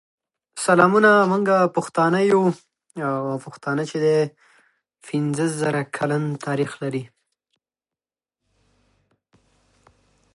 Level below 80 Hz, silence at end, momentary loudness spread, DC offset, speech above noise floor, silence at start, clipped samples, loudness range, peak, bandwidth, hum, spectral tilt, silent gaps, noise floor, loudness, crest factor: -70 dBFS; 3.3 s; 14 LU; under 0.1%; over 70 dB; 0.55 s; under 0.1%; 13 LU; -2 dBFS; 11.5 kHz; none; -6 dB/octave; none; under -90 dBFS; -21 LUFS; 22 dB